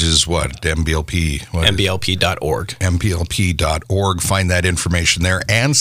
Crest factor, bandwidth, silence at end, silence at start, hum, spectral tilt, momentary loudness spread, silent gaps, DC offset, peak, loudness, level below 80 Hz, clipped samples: 16 dB; 16 kHz; 0 s; 0 s; none; -3.5 dB/octave; 5 LU; none; under 0.1%; 0 dBFS; -17 LUFS; -28 dBFS; under 0.1%